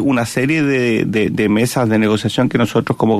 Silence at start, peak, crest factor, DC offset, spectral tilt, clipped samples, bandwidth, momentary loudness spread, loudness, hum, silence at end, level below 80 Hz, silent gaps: 0 s; -2 dBFS; 12 dB; under 0.1%; -6 dB/octave; under 0.1%; 14 kHz; 2 LU; -15 LUFS; none; 0 s; -48 dBFS; none